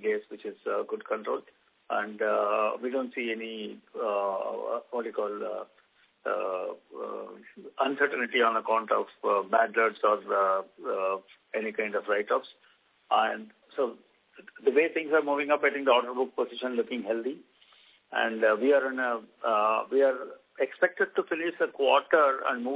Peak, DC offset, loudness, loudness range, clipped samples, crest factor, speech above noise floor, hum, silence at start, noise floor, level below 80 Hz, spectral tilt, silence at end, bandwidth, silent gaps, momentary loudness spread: -8 dBFS; under 0.1%; -28 LUFS; 6 LU; under 0.1%; 20 dB; 32 dB; none; 0 s; -60 dBFS; -88 dBFS; -7 dB/octave; 0 s; 4 kHz; none; 13 LU